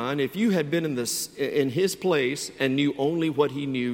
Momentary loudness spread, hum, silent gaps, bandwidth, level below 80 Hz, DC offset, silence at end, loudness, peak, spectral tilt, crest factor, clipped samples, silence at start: 4 LU; none; none; 17 kHz; -64 dBFS; under 0.1%; 0 s; -25 LUFS; -8 dBFS; -4.5 dB/octave; 18 dB; under 0.1%; 0 s